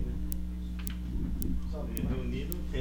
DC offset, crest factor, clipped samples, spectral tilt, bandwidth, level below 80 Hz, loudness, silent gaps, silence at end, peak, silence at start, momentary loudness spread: under 0.1%; 26 dB; under 0.1%; -6.5 dB/octave; over 20 kHz; -36 dBFS; -36 LUFS; none; 0 s; -8 dBFS; 0 s; 4 LU